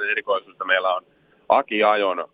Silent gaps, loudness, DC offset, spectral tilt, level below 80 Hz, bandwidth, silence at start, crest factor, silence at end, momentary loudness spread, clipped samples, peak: none; -21 LUFS; under 0.1%; -6 dB/octave; -72 dBFS; 4.9 kHz; 0 s; 20 dB; 0.1 s; 7 LU; under 0.1%; -2 dBFS